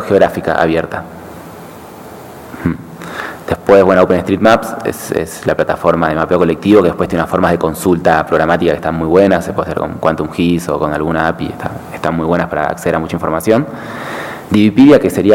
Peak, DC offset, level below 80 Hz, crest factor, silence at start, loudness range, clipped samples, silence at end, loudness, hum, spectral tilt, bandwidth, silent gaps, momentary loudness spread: 0 dBFS; under 0.1%; -38 dBFS; 12 dB; 0 s; 5 LU; 0.3%; 0 s; -13 LUFS; none; -6.5 dB/octave; 17.5 kHz; none; 16 LU